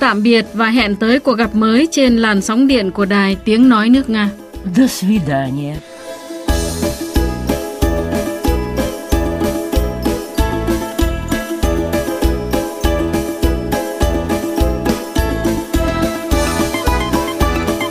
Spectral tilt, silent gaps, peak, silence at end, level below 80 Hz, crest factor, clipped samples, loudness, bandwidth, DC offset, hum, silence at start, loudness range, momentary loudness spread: -5.5 dB/octave; none; 0 dBFS; 0 s; -24 dBFS; 14 dB; under 0.1%; -16 LUFS; 15.5 kHz; 0.3%; none; 0 s; 6 LU; 8 LU